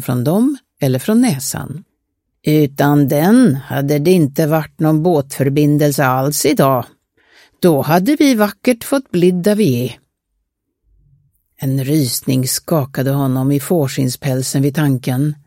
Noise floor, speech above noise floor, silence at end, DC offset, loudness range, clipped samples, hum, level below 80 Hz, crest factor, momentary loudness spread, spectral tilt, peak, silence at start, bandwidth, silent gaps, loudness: -71 dBFS; 57 dB; 0.1 s; under 0.1%; 5 LU; under 0.1%; none; -54 dBFS; 14 dB; 7 LU; -6 dB/octave; 0 dBFS; 0 s; 17 kHz; none; -15 LUFS